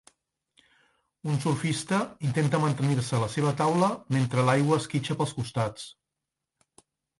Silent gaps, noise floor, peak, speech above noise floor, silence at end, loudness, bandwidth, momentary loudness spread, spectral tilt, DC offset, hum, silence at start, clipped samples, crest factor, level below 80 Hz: none; -86 dBFS; -10 dBFS; 60 dB; 1.3 s; -27 LUFS; 11.5 kHz; 7 LU; -6 dB/octave; under 0.1%; none; 1.25 s; under 0.1%; 18 dB; -62 dBFS